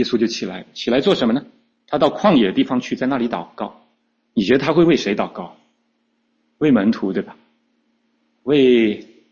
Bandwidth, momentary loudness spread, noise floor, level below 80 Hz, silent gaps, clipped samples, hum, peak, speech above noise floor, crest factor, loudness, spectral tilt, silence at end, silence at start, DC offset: 7.4 kHz; 16 LU; -67 dBFS; -56 dBFS; none; under 0.1%; none; -2 dBFS; 50 dB; 16 dB; -18 LUFS; -6 dB/octave; 0.3 s; 0 s; under 0.1%